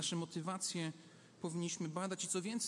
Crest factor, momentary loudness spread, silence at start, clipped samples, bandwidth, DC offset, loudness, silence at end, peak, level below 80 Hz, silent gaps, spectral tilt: 16 dB; 9 LU; 0 s; under 0.1%; 11.5 kHz; under 0.1%; -41 LUFS; 0 s; -26 dBFS; -88 dBFS; none; -3.5 dB/octave